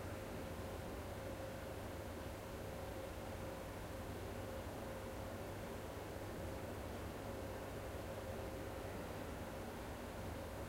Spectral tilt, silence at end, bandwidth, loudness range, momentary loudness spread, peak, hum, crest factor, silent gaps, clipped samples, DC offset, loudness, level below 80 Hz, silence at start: -5.5 dB/octave; 0 s; 16 kHz; 1 LU; 1 LU; -34 dBFS; none; 14 dB; none; under 0.1%; under 0.1%; -48 LUFS; -56 dBFS; 0 s